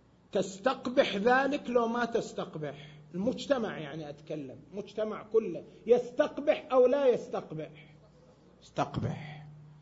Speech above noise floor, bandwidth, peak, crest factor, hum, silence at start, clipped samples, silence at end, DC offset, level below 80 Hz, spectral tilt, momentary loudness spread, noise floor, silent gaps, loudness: 28 dB; 8 kHz; -12 dBFS; 20 dB; none; 0.35 s; under 0.1%; 0.1 s; under 0.1%; -64 dBFS; -5.5 dB/octave; 16 LU; -59 dBFS; none; -31 LUFS